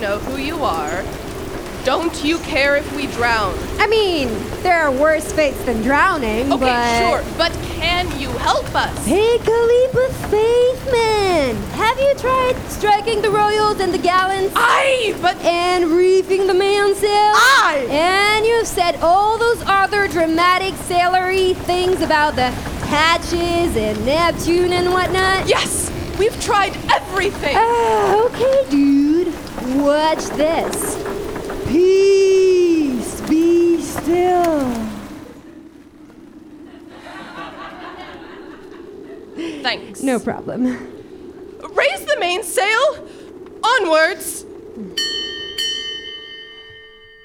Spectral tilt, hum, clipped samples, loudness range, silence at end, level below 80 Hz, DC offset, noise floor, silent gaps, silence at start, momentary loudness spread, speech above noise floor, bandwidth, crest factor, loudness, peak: -4 dB/octave; none; under 0.1%; 10 LU; 0.35 s; -36 dBFS; under 0.1%; -42 dBFS; none; 0 s; 16 LU; 26 dB; over 20 kHz; 16 dB; -16 LUFS; -2 dBFS